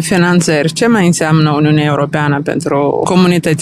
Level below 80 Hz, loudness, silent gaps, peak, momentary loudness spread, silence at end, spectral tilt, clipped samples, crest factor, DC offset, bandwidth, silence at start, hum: -48 dBFS; -11 LUFS; none; 0 dBFS; 4 LU; 0 s; -5.5 dB/octave; under 0.1%; 10 dB; 0.2%; 14 kHz; 0 s; none